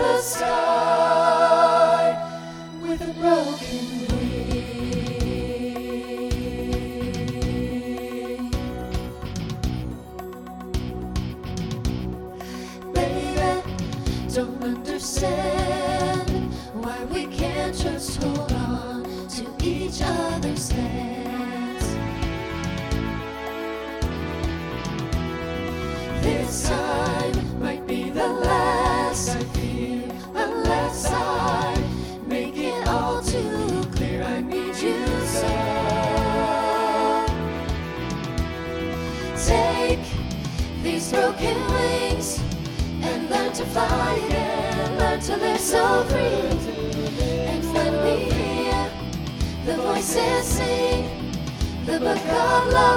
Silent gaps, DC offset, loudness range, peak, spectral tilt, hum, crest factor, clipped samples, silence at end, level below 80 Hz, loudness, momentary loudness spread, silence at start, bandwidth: none; under 0.1%; 6 LU; -4 dBFS; -5 dB/octave; none; 20 dB; under 0.1%; 0 s; -34 dBFS; -24 LUFS; 10 LU; 0 s; 17.5 kHz